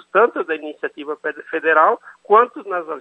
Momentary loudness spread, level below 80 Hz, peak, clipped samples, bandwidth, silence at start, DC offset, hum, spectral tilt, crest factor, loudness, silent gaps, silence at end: 13 LU; -78 dBFS; 0 dBFS; under 0.1%; 4 kHz; 0.15 s; under 0.1%; none; -6 dB/octave; 18 dB; -19 LUFS; none; 0 s